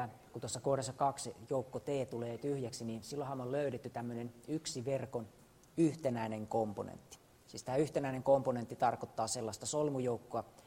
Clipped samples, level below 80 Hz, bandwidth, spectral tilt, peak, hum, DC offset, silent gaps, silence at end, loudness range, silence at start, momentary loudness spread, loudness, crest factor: under 0.1%; -70 dBFS; 16 kHz; -5.5 dB/octave; -18 dBFS; none; under 0.1%; none; 0.05 s; 4 LU; 0 s; 12 LU; -38 LUFS; 20 dB